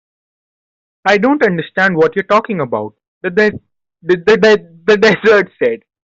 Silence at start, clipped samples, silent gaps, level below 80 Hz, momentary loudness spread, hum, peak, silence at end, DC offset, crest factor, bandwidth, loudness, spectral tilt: 1.05 s; under 0.1%; 3.08-3.21 s; -54 dBFS; 11 LU; none; -2 dBFS; 0.35 s; under 0.1%; 12 dB; 7.6 kHz; -13 LUFS; -5.5 dB/octave